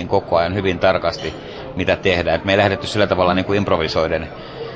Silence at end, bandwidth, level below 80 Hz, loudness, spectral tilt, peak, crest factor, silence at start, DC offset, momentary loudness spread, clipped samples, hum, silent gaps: 0 s; 8 kHz; -38 dBFS; -18 LUFS; -6 dB/octave; -2 dBFS; 16 dB; 0 s; under 0.1%; 12 LU; under 0.1%; none; none